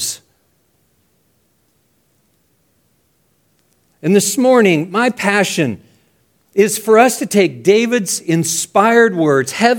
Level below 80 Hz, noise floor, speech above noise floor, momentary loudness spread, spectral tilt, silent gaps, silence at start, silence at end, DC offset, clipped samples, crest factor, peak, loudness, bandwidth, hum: -64 dBFS; -60 dBFS; 48 dB; 9 LU; -4 dB/octave; none; 0 s; 0 s; under 0.1%; under 0.1%; 16 dB; 0 dBFS; -13 LUFS; 18 kHz; none